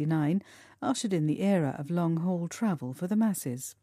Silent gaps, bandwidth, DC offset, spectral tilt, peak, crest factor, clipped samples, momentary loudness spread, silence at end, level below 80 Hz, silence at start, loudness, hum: none; 15.5 kHz; under 0.1%; -6.5 dB/octave; -14 dBFS; 14 dB; under 0.1%; 7 LU; 0.1 s; -74 dBFS; 0 s; -30 LUFS; none